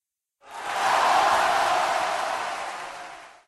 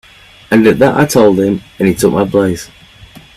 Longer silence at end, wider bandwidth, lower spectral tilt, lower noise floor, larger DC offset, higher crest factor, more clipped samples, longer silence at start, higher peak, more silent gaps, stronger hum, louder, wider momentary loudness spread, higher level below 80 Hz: second, 0.15 s vs 0.7 s; second, 13 kHz vs 15 kHz; second, -1 dB/octave vs -6 dB/octave; first, -56 dBFS vs -38 dBFS; neither; about the same, 16 dB vs 12 dB; neither; about the same, 0.45 s vs 0.5 s; second, -10 dBFS vs 0 dBFS; neither; neither; second, -23 LUFS vs -11 LUFS; first, 18 LU vs 8 LU; second, -62 dBFS vs -42 dBFS